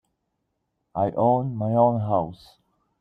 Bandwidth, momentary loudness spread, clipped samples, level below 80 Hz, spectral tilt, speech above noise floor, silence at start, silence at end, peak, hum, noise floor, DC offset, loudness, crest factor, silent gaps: 5.2 kHz; 10 LU; under 0.1%; -62 dBFS; -11 dB/octave; 54 dB; 0.95 s; 0.65 s; -6 dBFS; none; -77 dBFS; under 0.1%; -23 LUFS; 18 dB; none